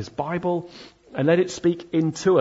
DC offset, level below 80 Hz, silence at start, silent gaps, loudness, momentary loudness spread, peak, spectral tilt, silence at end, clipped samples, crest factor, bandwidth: under 0.1%; -60 dBFS; 0 s; none; -23 LUFS; 10 LU; -6 dBFS; -6.5 dB/octave; 0 s; under 0.1%; 16 dB; 8 kHz